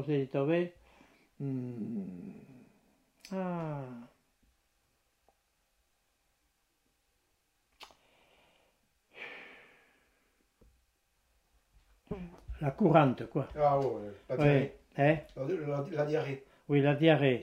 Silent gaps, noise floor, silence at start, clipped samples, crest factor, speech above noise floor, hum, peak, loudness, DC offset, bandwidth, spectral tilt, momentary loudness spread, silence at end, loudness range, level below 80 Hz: none; -77 dBFS; 0 s; under 0.1%; 24 dB; 46 dB; none; -10 dBFS; -31 LUFS; under 0.1%; 8.2 kHz; -8.5 dB/octave; 20 LU; 0 s; 24 LU; -62 dBFS